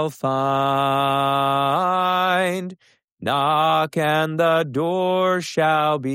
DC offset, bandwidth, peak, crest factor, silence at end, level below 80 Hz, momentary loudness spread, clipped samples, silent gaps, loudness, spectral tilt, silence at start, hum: under 0.1%; 16 kHz; -8 dBFS; 12 dB; 0 s; -64 dBFS; 4 LU; under 0.1%; 3.04-3.17 s; -20 LUFS; -5.5 dB/octave; 0 s; none